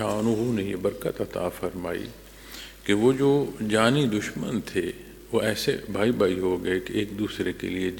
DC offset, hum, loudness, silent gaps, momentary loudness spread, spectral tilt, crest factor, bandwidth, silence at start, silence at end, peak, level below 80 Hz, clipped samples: under 0.1%; none; -26 LUFS; none; 13 LU; -5.5 dB/octave; 22 dB; 17.5 kHz; 0 s; 0 s; -4 dBFS; -52 dBFS; under 0.1%